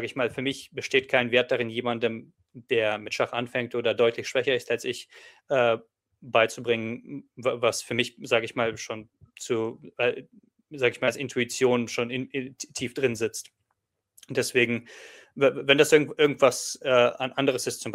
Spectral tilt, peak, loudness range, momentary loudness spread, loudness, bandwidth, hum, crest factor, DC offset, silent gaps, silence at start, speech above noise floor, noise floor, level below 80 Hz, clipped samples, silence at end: -3.5 dB/octave; -4 dBFS; 6 LU; 13 LU; -26 LUFS; 16 kHz; none; 22 dB; under 0.1%; none; 0 s; 53 dB; -79 dBFS; -70 dBFS; under 0.1%; 0 s